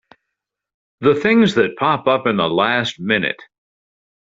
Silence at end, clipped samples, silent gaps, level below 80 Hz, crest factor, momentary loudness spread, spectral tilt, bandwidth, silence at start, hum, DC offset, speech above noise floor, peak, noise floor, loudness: 0.9 s; under 0.1%; none; -56 dBFS; 18 dB; 6 LU; -6 dB/octave; 7.8 kHz; 1 s; none; under 0.1%; 64 dB; -2 dBFS; -80 dBFS; -17 LUFS